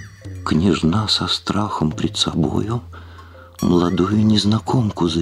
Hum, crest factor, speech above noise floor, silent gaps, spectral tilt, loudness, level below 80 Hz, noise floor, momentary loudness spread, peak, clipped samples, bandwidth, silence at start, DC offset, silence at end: none; 16 dB; 22 dB; none; -5.5 dB/octave; -18 LUFS; -42 dBFS; -40 dBFS; 11 LU; -2 dBFS; under 0.1%; 12.5 kHz; 0 s; under 0.1%; 0 s